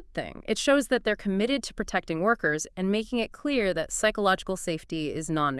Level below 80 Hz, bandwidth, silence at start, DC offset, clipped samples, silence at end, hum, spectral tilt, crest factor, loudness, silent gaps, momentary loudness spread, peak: -50 dBFS; 12 kHz; 0 s; under 0.1%; under 0.1%; 0 s; none; -4 dB/octave; 18 dB; -27 LUFS; none; 8 LU; -8 dBFS